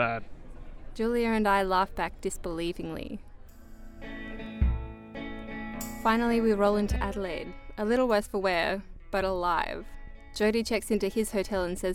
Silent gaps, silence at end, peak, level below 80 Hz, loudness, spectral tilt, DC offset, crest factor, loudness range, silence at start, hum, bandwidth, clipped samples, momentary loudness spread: none; 0 s; -12 dBFS; -40 dBFS; -29 LUFS; -5.5 dB/octave; under 0.1%; 18 dB; 8 LU; 0 s; none; 17 kHz; under 0.1%; 16 LU